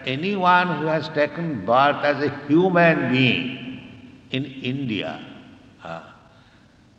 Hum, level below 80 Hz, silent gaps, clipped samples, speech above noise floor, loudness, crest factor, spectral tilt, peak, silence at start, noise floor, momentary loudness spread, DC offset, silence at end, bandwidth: none; -62 dBFS; none; under 0.1%; 32 dB; -21 LUFS; 18 dB; -7.5 dB/octave; -4 dBFS; 0 s; -53 dBFS; 19 LU; under 0.1%; 0.85 s; 8 kHz